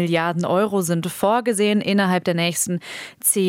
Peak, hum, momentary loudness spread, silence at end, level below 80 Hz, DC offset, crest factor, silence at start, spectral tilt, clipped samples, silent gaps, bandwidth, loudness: -4 dBFS; none; 4 LU; 0 s; -68 dBFS; under 0.1%; 16 dB; 0 s; -4 dB/octave; under 0.1%; none; 17.5 kHz; -20 LUFS